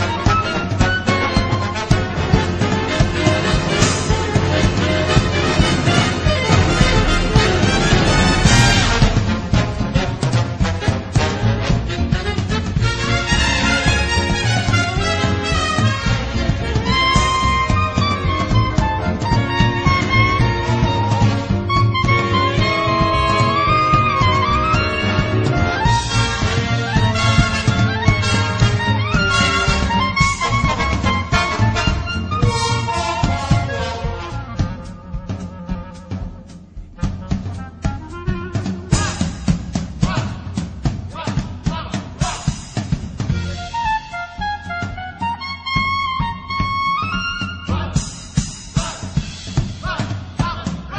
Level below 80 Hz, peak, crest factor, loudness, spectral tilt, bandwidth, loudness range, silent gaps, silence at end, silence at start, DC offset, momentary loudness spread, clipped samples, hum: -26 dBFS; 0 dBFS; 18 dB; -18 LUFS; -5 dB/octave; 9.8 kHz; 8 LU; none; 0 s; 0 s; under 0.1%; 10 LU; under 0.1%; none